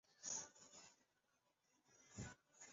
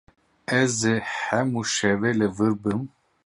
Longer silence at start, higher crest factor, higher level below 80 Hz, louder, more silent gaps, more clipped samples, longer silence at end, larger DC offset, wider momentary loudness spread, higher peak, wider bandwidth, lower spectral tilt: second, 0.05 s vs 0.5 s; about the same, 22 dB vs 18 dB; second, -78 dBFS vs -58 dBFS; second, -54 LUFS vs -24 LUFS; neither; neither; second, 0 s vs 0.4 s; neither; first, 15 LU vs 7 LU; second, -36 dBFS vs -6 dBFS; second, 7.6 kHz vs 11.5 kHz; about the same, -3.5 dB/octave vs -4.5 dB/octave